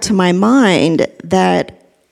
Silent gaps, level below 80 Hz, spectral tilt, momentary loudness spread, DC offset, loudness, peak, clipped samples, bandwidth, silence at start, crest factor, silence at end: none; -48 dBFS; -5.5 dB/octave; 7 LU; under 0.1%; -13 LUFS; 0 dBFS; under 0.1%; 12.5 kHz; 0 s; 14 dB; 0.4 s